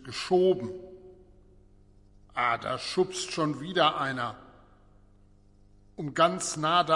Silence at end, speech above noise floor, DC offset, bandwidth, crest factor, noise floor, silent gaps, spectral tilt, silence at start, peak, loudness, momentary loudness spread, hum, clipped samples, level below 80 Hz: 0 s; 31 dB; under 0.1%; 11.5 kHz; 20 dB; -58 dBFS; none; -4 dB/octave; 0 s; -10 dBFS; -28 LUFS; 15 LU; 50 Hz at -60 dBFS; under 0.1%; -60 dBFS